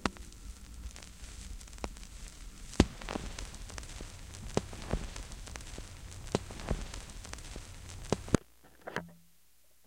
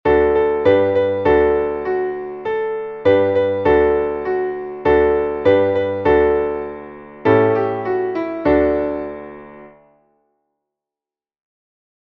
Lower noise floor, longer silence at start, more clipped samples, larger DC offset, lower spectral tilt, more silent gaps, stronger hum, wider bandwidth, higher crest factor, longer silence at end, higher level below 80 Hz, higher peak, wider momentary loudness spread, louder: second, -68 dBFS vs under -90 dBFS; about the same, 0 s vs 0.05 s; neither; neither; second, -5 dB/octave vs -8.5 dB/octave; neither; neither; first, 17 kHz vs 5.4 kHz; first, 34 dB vs 16 dB; second, 0.65 s vs 2.5 s; second, -46 dBFS vs -40 dBFS; about the same, -4 dBFS vs -2 dBFS; first, 16 LU vs 11 LU; second, -40 LUFS vs -17 LUFS